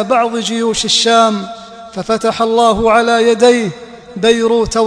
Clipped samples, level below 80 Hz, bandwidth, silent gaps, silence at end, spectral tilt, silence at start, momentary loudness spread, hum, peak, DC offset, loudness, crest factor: 0.1%; -40 dBFS; 11 kHz; none; 0 s; -3.5 dB/octave; 0 s; 17 LU; none; 0 dBFS; under 0.1%; -12 LUFS; 12 dB